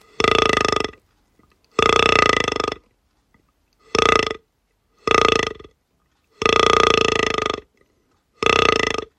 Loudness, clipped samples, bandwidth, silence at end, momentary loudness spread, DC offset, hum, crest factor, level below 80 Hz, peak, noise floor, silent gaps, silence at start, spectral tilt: -18 LUFS; under 0.1%; 12.5 kHz; 0.2 s; 13 LU; under 0.1%; none; 20 dB; -42 dBFS; 0 dBFS; -67 dBFS; none; 0.2 s; -3 dB/octave